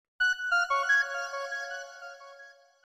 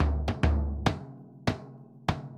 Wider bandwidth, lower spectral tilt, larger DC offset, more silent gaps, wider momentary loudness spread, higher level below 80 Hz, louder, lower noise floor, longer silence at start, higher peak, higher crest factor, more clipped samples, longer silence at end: first, 16 kHz vs 9.8 kHz; second, 4.5 dB/octave vs -6.5 dB/octave; neither; neither; first, 21 LU vs 13 LU; second, -74 dBFS vs -34 dBFS; first, -28 LUFS vs -31 LUFS; first, -54 dBFS vs -48 dBFS; first, 0.2 s vs 0 s; second, -16 dBFS vs -6 dBFS; second, 16 dB vs 22 dB; neither; first, 0.3 s vs 0 s